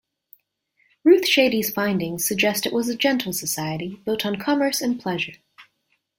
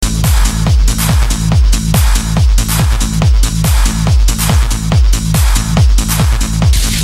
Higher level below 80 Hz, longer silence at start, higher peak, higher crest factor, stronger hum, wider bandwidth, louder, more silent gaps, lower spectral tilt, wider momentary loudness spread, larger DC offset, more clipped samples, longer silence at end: second, -62 dBFS vs -12 dBFS; first, 1.05 s vs 0 s; second, -4 dBFS vs 0 dBFS; first, 18 dB vs 10 dB; neither; about the same, 16.5 kHz vs 15.5 kHz; second, -21 LUFS vs -12 LUFS; neither; about the same, -3.5 dB/octave vs -4.5 dB/octave; first, 10 LU vs 1 LU; neither; neither; first, 0.55 s vs 0 s